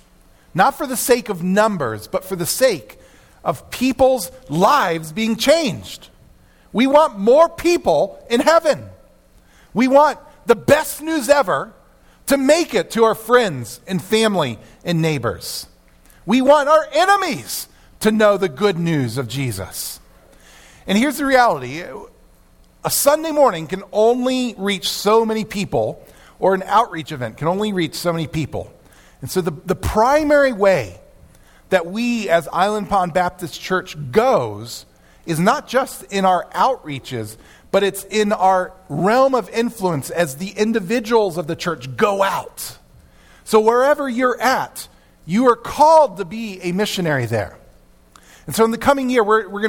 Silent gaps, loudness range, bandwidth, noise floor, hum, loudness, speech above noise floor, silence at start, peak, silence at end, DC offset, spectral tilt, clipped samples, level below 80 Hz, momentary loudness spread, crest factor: none; 4 LU; 18 kHz; -50 dBFS; none; -18 LUFS; 33 dB; 0.55 s; 0 dBFS; 0 s; under 0.1%; -4.5 dB/octave; under 0.1%; -46 dBFS; 13 LU; 18 dB